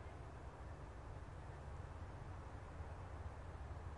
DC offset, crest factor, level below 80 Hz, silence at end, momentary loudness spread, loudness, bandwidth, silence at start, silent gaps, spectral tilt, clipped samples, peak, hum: under 0.1%; 12 dB; -56 dBFS; 0 s; 2 LU; -54 LUFS; 11 kHz; 0 s; none; -7 dB/octave; under 0.1%; -38 dBFS; none